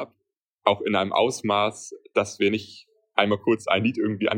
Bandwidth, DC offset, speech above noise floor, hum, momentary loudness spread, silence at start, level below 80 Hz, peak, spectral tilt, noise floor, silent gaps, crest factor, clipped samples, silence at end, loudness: 16 kHz; under 0.1%; 55 dB; none; 7 LU; 0 s; -68 dBFS; -2 dBFS; -4.5 dB/octave; -79 dBFS; 0.38-0.58 s; 22 dB; under 0.1%; 0 s; -24 LUFS